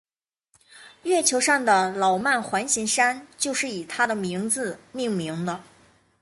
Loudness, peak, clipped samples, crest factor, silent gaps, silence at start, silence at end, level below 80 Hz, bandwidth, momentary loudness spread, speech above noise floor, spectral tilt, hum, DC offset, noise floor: -23 LUFS; -6 dBFS; under 0.1%; 18 dB; none; 0.75 s; 0.6 s; -66 dBFS; 12 kHz; 11 LU; 48 dB; -2.5 dB/octave; none; under 0.1%; -72 dBFS